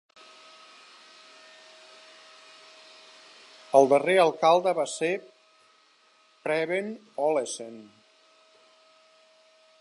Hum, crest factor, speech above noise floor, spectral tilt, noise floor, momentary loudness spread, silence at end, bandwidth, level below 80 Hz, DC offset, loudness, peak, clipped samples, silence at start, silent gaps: none; 24 dB; 38 dB; -4 dB/octave; -62 dBFS; 28 LU; 2 s; 11.5 kHz; -88 dBFS; under 0.1%; -25 LUFS; -4 dBFS; under 0.1%; 3.75 s; none